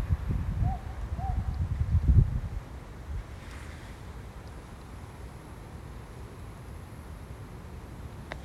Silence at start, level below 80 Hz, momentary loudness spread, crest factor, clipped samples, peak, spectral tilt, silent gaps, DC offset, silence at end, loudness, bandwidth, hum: 0 s; -36 dBFS; 17 LU; 24 dB; under 0.1%; -8 dBFS; -7.5 dB/octave; none; under 0.1%; 0 s; -34 LUFS; 12.5 kHz; none